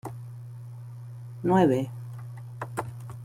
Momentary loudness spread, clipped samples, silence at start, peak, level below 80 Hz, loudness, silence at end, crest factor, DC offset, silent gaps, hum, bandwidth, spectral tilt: 20 LU; under 0.1%; 0.05 s; -10 dBFS; -64 dBFS; -27 LUFS; 0 s; 20 dB; under 0.1%; none; none; 16 kHz; -8 dB/octave